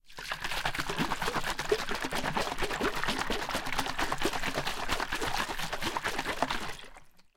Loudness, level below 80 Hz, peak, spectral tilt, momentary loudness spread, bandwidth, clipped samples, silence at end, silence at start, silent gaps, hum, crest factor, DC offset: -32 LUFS; -44 dBFS; -10 dBFS; -3 dB/octave; 3 LU; 17 kHz; under 0.1%; 0.15 s; 0.05 s; none; none; 22 dB; under 0.1%